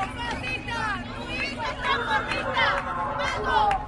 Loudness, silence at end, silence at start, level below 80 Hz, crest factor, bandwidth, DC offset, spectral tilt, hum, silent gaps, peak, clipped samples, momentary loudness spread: -26 LUFS; 0 s; 0 s; -42 dBFS; 18 dB; 11.5 kHz; under 0.1%; -4 dB/octave; none; none; -10 dBFS; under 0.1%; 7 LU